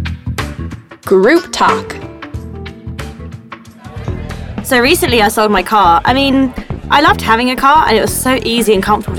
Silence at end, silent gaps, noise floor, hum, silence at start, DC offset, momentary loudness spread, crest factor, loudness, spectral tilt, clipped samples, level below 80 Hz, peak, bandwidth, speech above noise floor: 0 s; none; -33 dBFS; none; 0 s; under 0.1%; 18 LU; 12 dB; -11 LUFS; -4.5 dB/octave; under 0.1%; -30 dBFS; 0 dBFS; 18 kHz; 23 dB